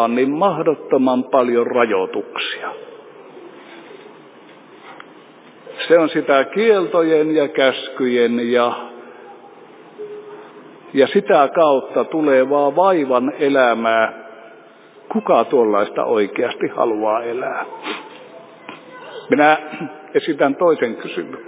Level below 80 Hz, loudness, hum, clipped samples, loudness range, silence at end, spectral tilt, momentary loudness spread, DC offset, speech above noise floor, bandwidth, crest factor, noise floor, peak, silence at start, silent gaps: -76 dBFS; -17 LUFS; none; under 0.1%; 7 LU; 0 s; -9 dB/octave; 21 LU; under 0.1%; 28 dB; 4 kHz; 18 dB; -44 dBFS; 0 dBFS; 0 s; none